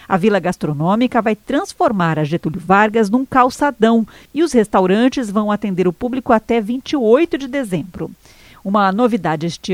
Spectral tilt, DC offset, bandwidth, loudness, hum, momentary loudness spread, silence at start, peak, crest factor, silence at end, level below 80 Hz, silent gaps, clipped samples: -6.5 dB/octave; under 0.1%; 15.5 kHz; -16 LUFS; none; 8 LU; 0.1 s; 0 dBFS; 16 dB; 0 s; -48 dBFS; none; under 0.1%